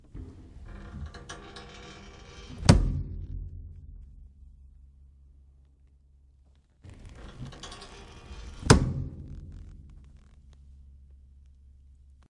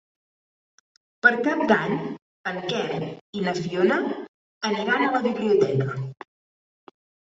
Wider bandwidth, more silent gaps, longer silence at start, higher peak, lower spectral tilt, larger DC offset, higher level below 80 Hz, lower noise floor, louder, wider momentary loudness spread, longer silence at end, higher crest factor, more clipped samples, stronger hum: first, 11.5 kHz vs 7.8 kHz; second, none vs 2.22-2.44 s, 3.21-3.33 s, 4.29-4.61 s; second, 0.15 s vs 1.25 s; about the same, -2 dBFS vs -2 dBFS; about the same, -5.5 dB/octave vs -6 dB/octave; neither; first, -40 dBFS vs -66 dBFS; second, -61 dBFS vs under -90 dBFS; second, -28 LUFS vs -24 LUFS; first, 28 LU vs 13 LU; about the same, 1.15 s vs 1.25 s; first, 30 dB vs 22 dB; neither; neither